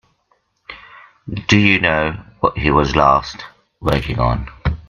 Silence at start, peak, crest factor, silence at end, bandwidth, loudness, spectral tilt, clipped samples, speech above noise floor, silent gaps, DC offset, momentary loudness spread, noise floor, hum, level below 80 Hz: 0.7 s; 0 dBFS; 18 dB; 0.1 s; 14.5 kHz; -16 LUFS; -6 dB/octave; under 0.1%; 47 dB; none; under 0.1%; 23 LU; -63 dBFS; none; -32 dBFS